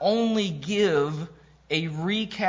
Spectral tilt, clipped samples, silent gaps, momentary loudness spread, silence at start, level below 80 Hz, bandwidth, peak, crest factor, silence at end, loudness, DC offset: -5.5 dB/octave; under 0.1%; none; 7 LU; 0 s; -60 dBFS; 7.6 kHz; -10 dBFS; 14 dB; 0 s; -26 LUFS; under 0.1%